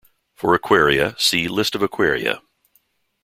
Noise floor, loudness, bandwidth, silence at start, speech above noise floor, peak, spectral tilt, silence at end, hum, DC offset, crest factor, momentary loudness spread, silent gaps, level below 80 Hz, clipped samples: -64 dBFS; -18 LUFS; 16.5 kHz; 0.4 s; 45 dB; -2 dBFS; -3.5 dB/octave; 0.85 s; none; under 0.1%; 18 dB; 9 LU; none; -50 dBFS; under 0.1%